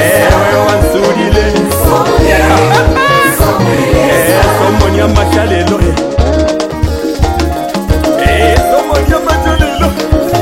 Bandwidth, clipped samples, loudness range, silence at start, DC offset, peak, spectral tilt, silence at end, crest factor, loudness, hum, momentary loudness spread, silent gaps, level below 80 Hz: 17 kHz; 1%; 3 LU; 0 s; 0.3%; 0 dBFS; -5.5 dB/octave; 0 s; 8 dB; -9 LUFS; none; 5 LU; none; -16 dBFS